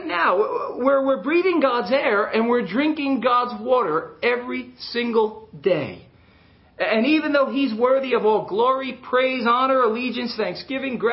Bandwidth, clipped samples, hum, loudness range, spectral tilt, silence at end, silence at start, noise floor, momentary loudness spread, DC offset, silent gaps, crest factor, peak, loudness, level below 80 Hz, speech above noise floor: 5.8 kHz; under 0.1%; none; 4 LU; -9.5 dB/octave; 0 s; 0 s; -53 dBFS; 7 LU; under 0.1%; none; 16 dB; -4 dBFS; -21 LUFS; -62 dBFS; 32 dB